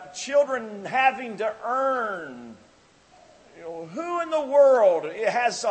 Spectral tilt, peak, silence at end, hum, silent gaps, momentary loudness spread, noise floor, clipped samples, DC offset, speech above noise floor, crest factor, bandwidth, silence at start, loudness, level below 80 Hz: -3 dB/octave; -6 dBFS; 0 s; none; none; 19 LU; -56 dBFS; under 0.1%; under 0.1%; 33 dB; 18 dB; 8.8 kHz; 0 s; -23 LUFS; -72 dBFS